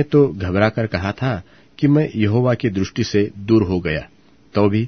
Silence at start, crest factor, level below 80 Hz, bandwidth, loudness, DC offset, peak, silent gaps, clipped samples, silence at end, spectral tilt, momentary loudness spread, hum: 0 s; 18 dB; -44 dBFS; 6.6 kHz; -19 LUFS; 0.2%; 0 dBFS; none; under 0.1%; 0 s; -7.5 dB/octave; 7 LU; none